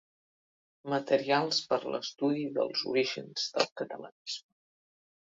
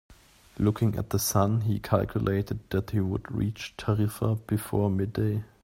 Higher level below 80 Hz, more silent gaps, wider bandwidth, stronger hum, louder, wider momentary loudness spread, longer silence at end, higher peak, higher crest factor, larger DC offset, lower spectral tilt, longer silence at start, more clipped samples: second, -80 dBFS vs -50 dBFS; first, 3.72-3.76 s, 4.12-4.25 s vs none; second, 7.8 kHz vs 16.5 kHz; neither; second, -31 LUFS vs -28 LUFS; first, 12 LU vs 5 LU; first, 1 s vs 0.2 s; second, -12 dBFS vs -8 dBFS; about the same, 22 dB vs 20 dB; neither; second, -3.5 dB/octave vs -6.5 dB/octave; first, 0.85 s vs 0.1 s; neither